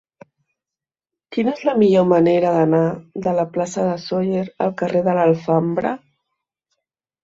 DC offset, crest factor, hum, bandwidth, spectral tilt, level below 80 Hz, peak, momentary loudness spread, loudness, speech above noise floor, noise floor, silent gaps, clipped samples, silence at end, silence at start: under 0.1%; 16 dB; none; 7.8 kHz; -7.5 dB/octave; -60 dBFS; -2 dBFS; 9 LU; -18 LUFS; 71 dB; -89 dBFS; none; under 0.1%; 1.25 s; 1.3 s